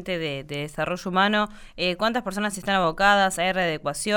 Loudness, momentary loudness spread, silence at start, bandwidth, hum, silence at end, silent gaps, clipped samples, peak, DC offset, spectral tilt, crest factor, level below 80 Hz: -24 LUFS; 10 LU; 0 s; 20 kHz; none; 0 s; none; under 0.1%; -6 dBFS; under 0.1%; -3.5 dB/octave; 18 dB; -48 dBFS